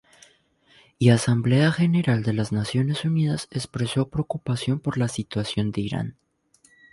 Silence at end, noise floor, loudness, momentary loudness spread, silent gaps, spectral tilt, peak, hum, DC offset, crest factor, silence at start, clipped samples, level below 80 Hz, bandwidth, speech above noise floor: 0.8 s; -61 dBFS; -24 LUFS; 9 LU; none; -6.5 dB/octave; -4 dBFS; none; under 0.1%; 20 dB; 1 s; under 0.1%; -52 dBFS; 11.5 kHz; 38 dB